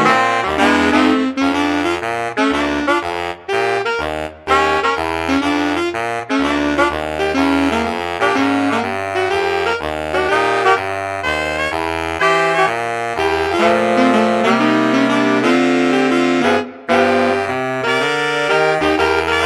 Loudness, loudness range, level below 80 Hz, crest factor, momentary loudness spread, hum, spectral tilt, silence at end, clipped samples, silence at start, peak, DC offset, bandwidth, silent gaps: -16 LUFS; 3 LU; -42 dBFS; 16 dB; 6 LU; none; -4.5 dB/octave; 0 s; under 0.1%; 0 s; 0 dBFS; under 0.1%; 14 kHz; none